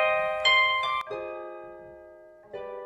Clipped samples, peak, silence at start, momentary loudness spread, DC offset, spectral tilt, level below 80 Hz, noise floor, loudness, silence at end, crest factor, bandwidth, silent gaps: under 0.1%; -10 dBFS; 0 s; 23 LU; under 0.1%; -1.5 dB/octave; -64 dBFS; -50 dBFS; -24 LUFS; 0 s; 18 dB; 11.5 kHz; none